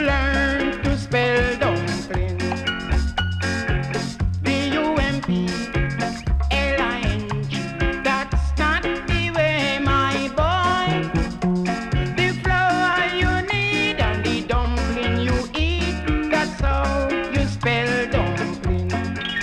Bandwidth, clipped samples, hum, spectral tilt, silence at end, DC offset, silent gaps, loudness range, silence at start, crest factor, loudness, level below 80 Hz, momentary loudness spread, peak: 11.5 kHz; under 0.1%; none; -5.5 dB/octave; 0 s; under 0.1%; none; 2 LU; 0 s; 12 dB; -21 LUFS; -28 dBFS; 5 LU; -10 dBFS